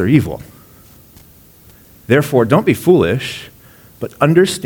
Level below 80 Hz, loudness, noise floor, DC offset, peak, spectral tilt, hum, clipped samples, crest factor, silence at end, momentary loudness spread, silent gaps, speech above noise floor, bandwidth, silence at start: -46 dBFS; -14 LUFS; -44 dBFS; under 0.1%; 0 dBFS; -6.5 dB/octave; none; under 0.1%; 16 dB; 0 s; 17 LU; none; 31 dB; 19.5 kHz; 0 s